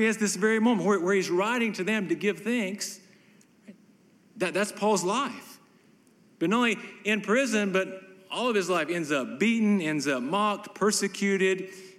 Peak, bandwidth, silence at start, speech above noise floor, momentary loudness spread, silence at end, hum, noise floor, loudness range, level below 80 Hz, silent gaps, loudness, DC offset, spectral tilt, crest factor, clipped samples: -12 dBFS; 15 kHz; 0 s; 33 dB; 8 LU; 0.1 s; none; -60 dBFS; 5 LU; -84 dBFS; none; -27 LUFS; under 0.1%; -4 dB/octave; 16 dB; under 0.1%